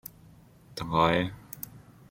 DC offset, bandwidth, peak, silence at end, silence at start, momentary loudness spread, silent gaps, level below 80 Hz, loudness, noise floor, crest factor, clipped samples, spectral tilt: under 0.1%; 16.5 kHz; -6 dBFS; 0.3 s; 0.7 s; 20 LU; none; -54 dBFS; -27 LUFS; -55 dBFS; 24 dB; under 0.1%; -5.5 dB/octave